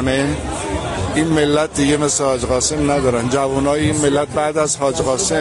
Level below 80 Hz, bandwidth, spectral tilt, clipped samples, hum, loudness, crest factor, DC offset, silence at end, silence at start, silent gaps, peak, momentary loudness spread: -34 dBFS; 11.5 kHz; -4.5 dB/octave; under 0.1%; none; -17 LUFS; 14 dB; under 0.1%; 0 s; 0 s; none; -2 dBFS; 5 LU